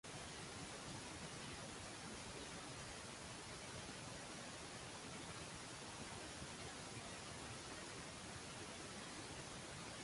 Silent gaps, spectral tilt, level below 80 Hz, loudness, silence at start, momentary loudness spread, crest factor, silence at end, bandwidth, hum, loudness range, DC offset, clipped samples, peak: none; -3 dB/octave; -68 dBFS; -51 LUFS; 0.05 s; 1 LU; 14 dB; 0 s; 11.5 kHz; none; 0 LU; under 0.1%; under 0.1%; -38 dBFS